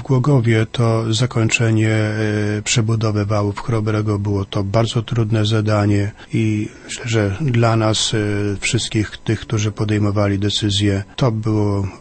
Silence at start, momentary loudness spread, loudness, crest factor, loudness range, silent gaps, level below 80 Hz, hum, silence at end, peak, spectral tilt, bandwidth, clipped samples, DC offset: 0 s; 5 LU; -18 LUFS; 16 dB; 2 LU; none; -42 dBFS; none; 0.05 s; 0 dBFS; -5.5 dB/octave; 8.8 kHz; under 0.1%; under 0.1%